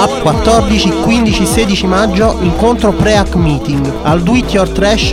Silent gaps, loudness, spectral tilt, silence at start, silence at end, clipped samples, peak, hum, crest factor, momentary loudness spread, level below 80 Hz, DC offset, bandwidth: none; -11 LUFS; -5.5 dB/octave; 0 s; 0 s; under 0.1%; 0 dBFS; none; 10 dB; 3 LU; -20 dBFS; 0.3%; 16.5 kHz